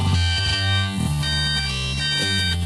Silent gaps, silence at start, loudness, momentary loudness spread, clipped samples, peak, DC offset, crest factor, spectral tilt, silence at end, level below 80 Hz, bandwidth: none; 0 s; -20 LUFS; 3 LU; under 0.1%; -8 dBFS; under 0.1%; 12 dB; -3.5 dB/octave; 0 s; -34 dBFS; 13 kHz